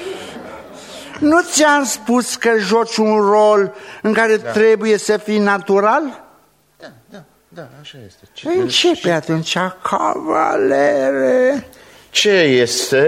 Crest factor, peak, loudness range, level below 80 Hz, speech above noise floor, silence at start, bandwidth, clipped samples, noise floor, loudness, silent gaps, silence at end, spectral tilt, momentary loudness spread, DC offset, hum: 16 dB; 0 dBFS; 6 LU; -60 dBFS; 38 dB; 0 s; 16 kHz; under 0.1%; -53 dBFS; -15 LUFS; none; 0 s; -3.5 dB/octave; 16 LU; under 0.1%; none